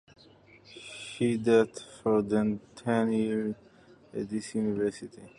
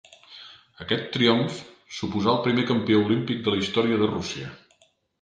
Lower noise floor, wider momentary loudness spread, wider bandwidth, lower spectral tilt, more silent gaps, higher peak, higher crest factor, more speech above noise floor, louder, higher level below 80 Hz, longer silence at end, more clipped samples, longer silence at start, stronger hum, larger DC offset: second, -57 dBFS vs -64 dBFS; about the same, 19 LU vs 19 LU; first, 11 kHz vs 9.2 kHz; about the same, -6.5 dB/octave vs -5.5 dB/octave; neither; second, -12 dBFS vs -6 dBFS; about the same, 18 dB vs 20 dB; second, 29 dB vs 40 dB; second, -29 LUFS vs -24 LUFS; second, -64 dBFS vs -56 dBFS; second, 0.1 s vs 0.65 s; neither; first, 0.7 s vs 0.3 s; neither; neither